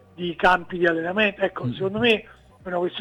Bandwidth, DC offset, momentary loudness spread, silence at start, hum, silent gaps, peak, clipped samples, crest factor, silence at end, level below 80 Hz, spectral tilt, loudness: 12 kHz; under 0.1%; 9 LU; 0.2 s; none; none; -6 dBFS; under 0.1%; 16 dB; 0 s; -52 dBFS; -6 dB/octave; -22 LUFS